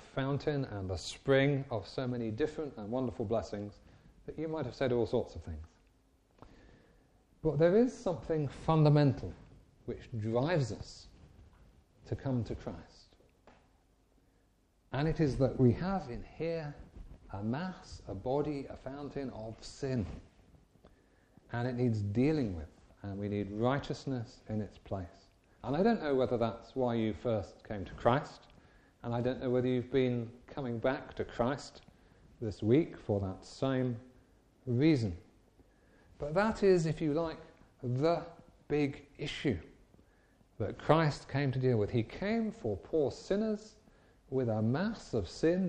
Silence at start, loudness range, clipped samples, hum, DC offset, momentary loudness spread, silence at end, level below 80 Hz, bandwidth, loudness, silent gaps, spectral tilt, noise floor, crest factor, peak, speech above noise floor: 0 s; 7 LU; under 0.1%; none; under 0.1%; 16 LU; 0 s; -56 dBFS; 9.8 kHz; -34 LUFS; none; -7.5 dB/octave; -70 dBFS; 24 dB; -10 dBFS; 37 dB